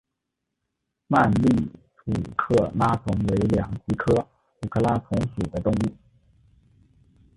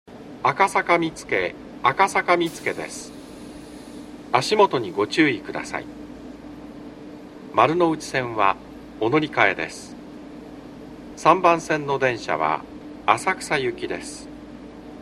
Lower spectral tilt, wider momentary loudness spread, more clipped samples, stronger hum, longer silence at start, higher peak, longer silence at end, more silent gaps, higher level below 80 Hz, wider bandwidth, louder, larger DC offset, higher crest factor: first, -8 dB/octave vs -4.5 dB/octave; second, 9 LU vs 21 LU; neither; neither; first, 1.1 s vs 0.1 s; second, -4 dBFS vs 0 dBFS; first, 1.45 s vs 0 s; neither; first, -42 dBFS vs -54 dBFS; second, 11.5 kHz vs 15 kHz; about the same, -24 LUFS vs -22 LUFS; neither; about the same, 20 dB vs 24 dB